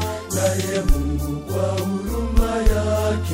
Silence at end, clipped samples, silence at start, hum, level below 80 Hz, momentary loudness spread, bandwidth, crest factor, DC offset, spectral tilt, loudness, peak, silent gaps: 0 s; under 0.1%; 0 s; none; -24 dBFS; 4 LU; 16.5 kHz; 16 dB; under 0.1%; -5.5 dB/octave; -22 LUFS; -4 dBFS; none